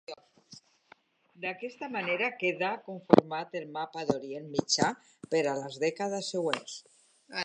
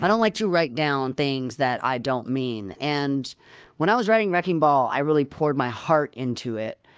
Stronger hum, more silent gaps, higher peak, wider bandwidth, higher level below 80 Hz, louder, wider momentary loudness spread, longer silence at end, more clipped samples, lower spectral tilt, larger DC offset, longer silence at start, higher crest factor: neither; neither; first, 0 dBFS vs -6 dBFS; first, 10.5 kHz vs 8 kHz; second, -72 dBFS vs -62 dBFS; second, -31 LUFS vs -23 LUFS; first, 16 LU vs 9 LU; second, 0 s vs 0.25 s; neither; second, -4 dB/octave vs -6 dB/octave; neither; about the same, 0.1 s vs 0 s; first, 32 dB vs 16 dB